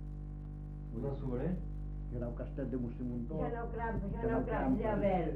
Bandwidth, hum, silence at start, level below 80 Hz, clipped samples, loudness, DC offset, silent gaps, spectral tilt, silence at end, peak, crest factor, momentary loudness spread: 4 kHz; 50 Hz at -40 dBFS; 0 s; -44 dBFS; under 0.1%; -38 LUFS; under 0.1%; none; -10.5 dB/octave; 0 s; -22 dBFS; 16 dB; 13 LU